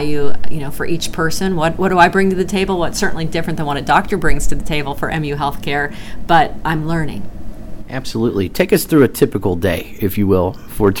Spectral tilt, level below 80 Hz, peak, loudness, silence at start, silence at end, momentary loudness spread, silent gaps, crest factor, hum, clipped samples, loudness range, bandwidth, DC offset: -5.5 dB/octave; -30 dBFS; 0 dBFS; -17 LUFS; 0 s; 0 s; 12 LU; none; 14 dB; none; under 0.1%; 3 LU; 19 kHz; under 0.1%